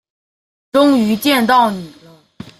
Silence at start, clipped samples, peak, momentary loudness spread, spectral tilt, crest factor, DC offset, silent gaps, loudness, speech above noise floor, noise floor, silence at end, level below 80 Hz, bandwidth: 0.75 s; under 0.1%; -2 dBFS; 7 LU; -4.5 dB/octave; 14 dB; under 0.1%; none; -13 LUFS; 25 dB; -38 dBFS; 0.1 s; -56 dBFS; 16 kHz